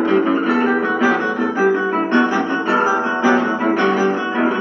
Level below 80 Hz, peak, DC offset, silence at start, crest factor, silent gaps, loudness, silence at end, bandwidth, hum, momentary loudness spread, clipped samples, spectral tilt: -70 dBFS; -4 dBFS; under 0.1%; 0 s; 14 dB; none; -17 LUFS; 0 s; 7 kHz; none; 3 LU; under 0.1%; -5.5 dB/octave